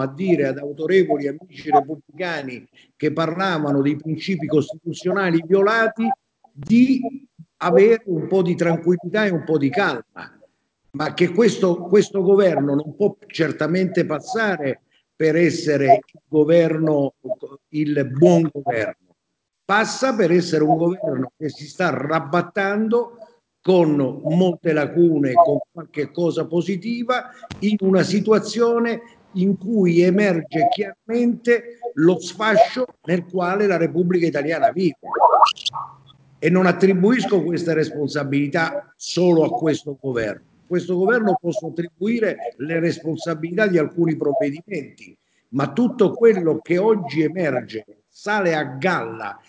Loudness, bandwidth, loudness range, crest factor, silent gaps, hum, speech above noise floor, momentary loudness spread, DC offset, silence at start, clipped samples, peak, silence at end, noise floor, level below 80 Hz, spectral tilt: -19 LUFS; 8 kHz; 4 LU; 20 dB; none; none; 58 dB; 12 LU; under 0.1%; 0 s; under 0.1%; 0 dBFS; 0.15 s; -77 dBFS; -64 dBFS; -6.5 dB/octave